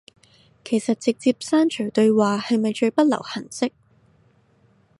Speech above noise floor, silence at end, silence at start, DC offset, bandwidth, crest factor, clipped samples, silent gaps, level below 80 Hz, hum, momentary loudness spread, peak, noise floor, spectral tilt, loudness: 39 dB; 1.3 s; 0.65 s; under 0.1%; 11.5 kHz; 18 dB; under 0.1%; none; -70 dBFS; none; 9 LU; -6 dBFS; -59 dBFS; -5 dB/octave; -21 LUFS